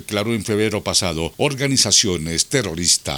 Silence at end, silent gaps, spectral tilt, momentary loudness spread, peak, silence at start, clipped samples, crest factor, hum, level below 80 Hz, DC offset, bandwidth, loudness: 0 s; none; -2.5 dB/octave; 8 LU; 0 dBFS; 0 s; under 0.1%; 18 dB; none; -46 dBFS; under 0.1%; over 20 kHz; -18 LUFS